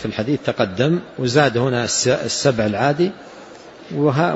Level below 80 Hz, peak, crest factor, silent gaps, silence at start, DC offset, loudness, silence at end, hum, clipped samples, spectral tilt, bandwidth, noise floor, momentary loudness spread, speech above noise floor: -52 dBFS; -2 dBFS; 18 dB; none; 0 s; under 0.1%; -19 LUFS; 0 s; none; under 0.1%; -4.5 dB/octave; 8 kHz; -39 dBFS; 8 LU; 21 dB